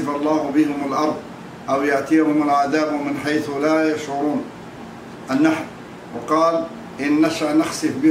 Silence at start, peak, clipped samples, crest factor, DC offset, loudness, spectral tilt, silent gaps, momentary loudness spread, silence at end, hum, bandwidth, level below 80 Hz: 0 s; -4 dBFS; under 0.1%; 14 dB; under 0.1%; -20 LUFS; -5.5 dB/octave; none; 16 LU; 0 s; none; 15 kHz; -58 dBFS